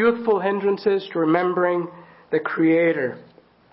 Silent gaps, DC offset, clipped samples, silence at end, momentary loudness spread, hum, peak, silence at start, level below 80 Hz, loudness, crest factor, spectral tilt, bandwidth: none; under 0.1%; under 0.1%; 0.5 s; 8 LU; none; -4 dBFS; 0 s; -66 dBFS; -21 LUFS; 16 dB; -11 dB/octave; 5.8 kHz